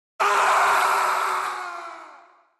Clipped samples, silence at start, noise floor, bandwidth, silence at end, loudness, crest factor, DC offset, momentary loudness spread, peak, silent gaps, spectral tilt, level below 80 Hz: under 0.1%; 0.2 s; -51 dBFS; 12.5 kHz; 0.45 s; -21 LUFS; 14 dB; under 0.1%; 16 LU; -10 dBFS; none; 0 dB/octave; -70 dBFS